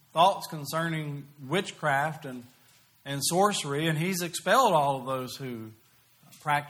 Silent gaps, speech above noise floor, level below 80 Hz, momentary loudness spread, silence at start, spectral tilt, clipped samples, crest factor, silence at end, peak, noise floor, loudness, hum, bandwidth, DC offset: none; 32 dB; -72 dBFS; 17 LU; 0.15 s; -4 dB/octave; under 0.1%; 20 dB; 0 s; -8 dBFS; -60 dBFS; -28 LUFS; none; over 20 kHz; under 0.1%